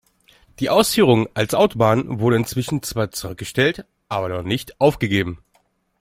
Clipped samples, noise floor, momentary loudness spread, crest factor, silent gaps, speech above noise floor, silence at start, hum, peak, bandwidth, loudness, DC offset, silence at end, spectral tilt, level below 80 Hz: under 0.1%; -63 dBFS; 11 LU; 18 dB; none; 44 dB; 0.6 s; none; -2 dBFS; 16.5 kHz; -20 LUFS; under 0.1%; 0.65 s; -5 dB/octave; -48 dBFS